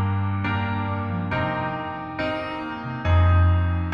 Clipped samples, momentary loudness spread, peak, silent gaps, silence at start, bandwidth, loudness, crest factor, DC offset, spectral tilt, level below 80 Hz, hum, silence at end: under 0.1%; 11 LU; -8 dBFS; none; 0 s; 5.6 kHz; -24 LUFS; 14 dB; under 0.1%; -9 dB/octave; -34 dBFS; none; 0 s